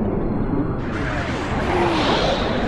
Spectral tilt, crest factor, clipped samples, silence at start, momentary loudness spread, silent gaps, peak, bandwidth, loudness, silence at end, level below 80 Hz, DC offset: -6 dB/octave; 14 dB; under 0.1%; 0 s; 6 LU; none; -6 dBFS; 11.5 kHz; -21 LUFS; 0 s; -30 dBFS; under 0.1%